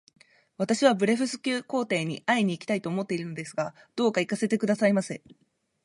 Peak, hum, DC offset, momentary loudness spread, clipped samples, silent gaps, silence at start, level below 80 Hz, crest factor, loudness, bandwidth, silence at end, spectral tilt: -8 dBFS; none; under 0.1%; 10 LU; under 0.1%; none; 0.6 s; -74 dBFS; 18 dB; -27 LUFS; 11.5 kHz; 0.7 s; -5 dB/octave